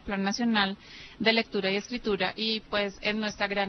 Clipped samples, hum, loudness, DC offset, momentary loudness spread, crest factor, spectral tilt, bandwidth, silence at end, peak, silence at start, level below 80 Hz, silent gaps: under 0.1%; none; -28 LUFS; under 0.1%; 5 LU; 20 dB; -4 dB/octave; 6.4 kHz; 0 s; -10 dBFS; 0.05 s; -56 dBFS; none